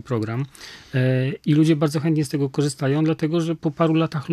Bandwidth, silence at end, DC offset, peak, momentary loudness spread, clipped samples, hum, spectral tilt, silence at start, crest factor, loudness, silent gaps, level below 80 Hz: 13.5 kHz; 0 s; under 0.1%; -6 dBFS; 9 LU; under 0.1%; none; -7 dB/octave; 0.05 s; 16 dB; -21 LUFS; none; -60 dBFS